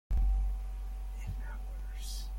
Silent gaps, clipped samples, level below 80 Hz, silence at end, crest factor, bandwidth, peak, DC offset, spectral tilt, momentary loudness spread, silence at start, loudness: none; under 0.1%; -34 dBFS; 0 s; 12 dB; 14.5 kHz; -22 dBFS; under 0.1%; -5 dB/octave; 10 LU; 0.1 s; -39 LUFS